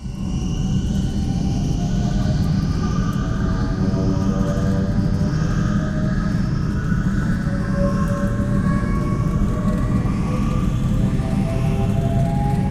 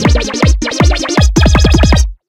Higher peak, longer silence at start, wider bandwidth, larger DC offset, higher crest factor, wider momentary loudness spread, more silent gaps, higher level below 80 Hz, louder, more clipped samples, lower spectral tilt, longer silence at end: second, -6 dBFS vs 0 dBFS; about the same, 0 s vs 0 s; first, 13 kHz vs 11.5 kHz; neither; about the same, 12 dB vs 10 dB; about the same, 2 LU vs 4 LU; neither; second, -26 dBFS vs -12 dBFS; second, -21 LUFS vs -10 LUFS; second, under 0.1% vs 0.2%; first, -7.5 dB/octave vs -5 dB/octave; second, 0 s vs 0.15 s